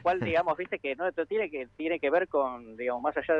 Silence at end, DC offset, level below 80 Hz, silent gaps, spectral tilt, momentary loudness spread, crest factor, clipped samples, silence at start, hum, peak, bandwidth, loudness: 0 s; under 0.1%; -62 dBFS; none; -7.5 dB/octave; 7 LU; 14 dB; under 0.1%; 0.05 s; none; -14 dBFS; 6.6 kHz; -30 LUFS